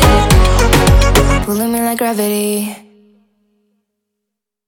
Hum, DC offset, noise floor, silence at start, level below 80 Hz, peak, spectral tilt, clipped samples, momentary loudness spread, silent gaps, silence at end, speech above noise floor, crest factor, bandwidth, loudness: none; under 0.1%; -78 dBFS; 0 s; -18 dBFS; 0 dBFS; -5 dB/octave; under 0.1%; 7 LU; none; 1.9 s; 62 dB; 12 dB; 19 kHz; -12 LUFS